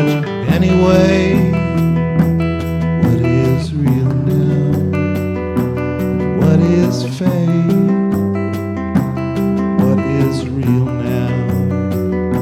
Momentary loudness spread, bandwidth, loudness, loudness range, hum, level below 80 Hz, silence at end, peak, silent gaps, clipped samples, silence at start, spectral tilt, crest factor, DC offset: 6 LU; 14.5 kHz; -15 LUFS; 2 LU; none; -34 dBFS; 0 s; -2 dBFS; none; under 0.1%; 0 s; -8 dB/octave; 12 dB; under 0.1%